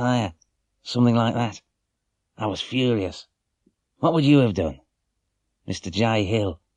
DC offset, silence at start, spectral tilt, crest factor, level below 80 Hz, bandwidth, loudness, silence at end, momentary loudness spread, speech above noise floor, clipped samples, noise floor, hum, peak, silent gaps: under 0.1%; 0 s; -6.5 dB/octave; 18 dB; -52 dBFS; 10 kHz; -23 LUFS; 0.2 s; 14 LU; 56 dB; under 0.1%; -78 dBFS; none; -6 dBFS; none